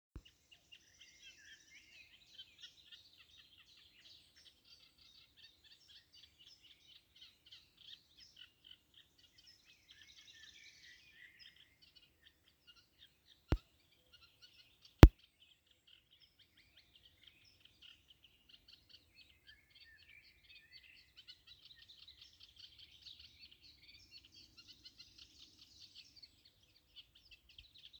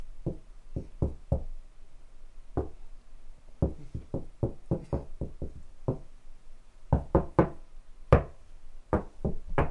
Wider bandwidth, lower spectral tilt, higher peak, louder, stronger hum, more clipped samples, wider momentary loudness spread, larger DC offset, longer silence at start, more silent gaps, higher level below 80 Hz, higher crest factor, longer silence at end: first, over 20 kHz vs 8.6 kHz; second, -7 dB/octave vs -9.5 dB/octave; first, 0 dBFS vs -6 dBFS; first, -29 LUFS vs -33 LUFS; neither; neither; second, 7 LU vs 18 LU; neither; first, 13.5 s vs 0 s; neither; second, -44 dBFS vs -38 dBFS; first, 42 dB vs 26 dB; first, 12.9 s vs 0 s